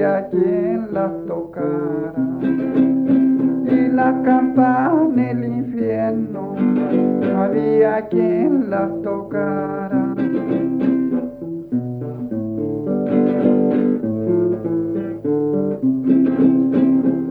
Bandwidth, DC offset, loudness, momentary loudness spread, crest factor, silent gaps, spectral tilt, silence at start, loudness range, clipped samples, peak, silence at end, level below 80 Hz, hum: 4.2 kHz; under 0.1%; -18 LUFS; 8 LU; 14 dB; none; -11 dB/octave; 0 s; 5 LU; under 0.1%; -2 dBFS; 0 s; -54 dBFS; 50 Hz at -55 dBFS